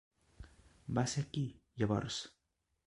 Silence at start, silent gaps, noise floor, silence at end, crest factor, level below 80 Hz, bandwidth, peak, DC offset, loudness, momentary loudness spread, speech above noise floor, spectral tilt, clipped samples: 0.4 s; none; -58 dBFS; 0.6 s; 20 dB; -60 dBFS; 11.5 kHz; -20 dBFS; under 0.1%; -38 LUFS; 23 LU; 21 dB; -5.5 dB/octave; under 0.1%